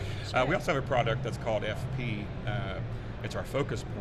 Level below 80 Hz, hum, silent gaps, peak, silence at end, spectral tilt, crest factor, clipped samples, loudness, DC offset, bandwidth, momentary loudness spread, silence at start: -44 dBFS; none; none; -14 dBFS; 0 s; -6 dB/octave; 18 dB; under 0.1%; -32 LUFS; under 0.1%; 13.5 kHz; 9 LU; 0 s